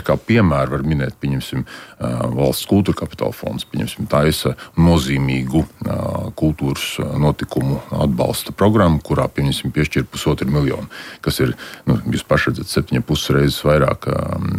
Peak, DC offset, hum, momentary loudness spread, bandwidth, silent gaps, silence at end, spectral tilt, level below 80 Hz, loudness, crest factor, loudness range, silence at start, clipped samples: -2 dBFS; under 0.1%; none; 9 LU; 16 kHz; none; 0 s; -6 dB/octave; -34 dBFS; -18 LUFS; 14 dB; 2 LU; 0 s; under 0.1%